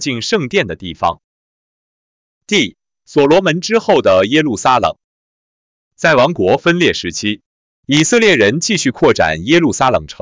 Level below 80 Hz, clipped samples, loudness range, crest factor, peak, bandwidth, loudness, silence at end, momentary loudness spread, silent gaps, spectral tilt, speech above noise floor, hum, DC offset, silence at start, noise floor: -44 dBFS; under 0.1%; 4 LU; 12 dB; -2 dBFS; 7.8 kHz; -13 LUFS; 0.1 s; 8 LU; 1.24-2.41 s, 5.04-5.91 s, 7.46-7.83 s; -4 dB/octave; over 77 dB; none; under 0.1%; 0 s; under -90 dBFS